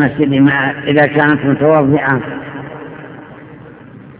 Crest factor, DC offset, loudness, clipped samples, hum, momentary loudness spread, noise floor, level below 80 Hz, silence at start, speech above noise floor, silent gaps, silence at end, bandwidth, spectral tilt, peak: 14 dB; under 0.1%; -12 LUFS; 0.1%; none; 20 LU; -35 dBFS; -48 dBFS; 0 s; 23 dB; none; 0.05 s; 4 kHz; -11 dB/octave; 0 dBFS